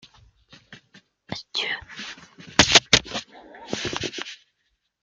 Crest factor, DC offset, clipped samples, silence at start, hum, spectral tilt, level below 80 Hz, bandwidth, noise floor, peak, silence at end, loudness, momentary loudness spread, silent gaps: 26 dB; under 0.1%; under 0.1%; 0.7 s; none; -1.5 dB/octave; -50 dBFS; 13.5 kHz; -73 dBFS; 0 dBFS; 0.7 s; -21 LUFS; 22 LU; none